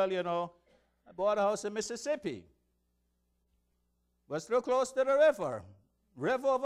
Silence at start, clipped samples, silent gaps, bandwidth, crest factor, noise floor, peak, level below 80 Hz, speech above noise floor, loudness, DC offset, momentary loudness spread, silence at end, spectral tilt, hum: 0 s; under 0.1%; none; 13 kHz; 16 dB; -77 dBFS; -16 dBFS; -72 dBFS; 46 dB; -32 LUFS; under 0.1%; 15 LU; 0 s; -4.5 dB/octave; 60 Hz at -75 dBFS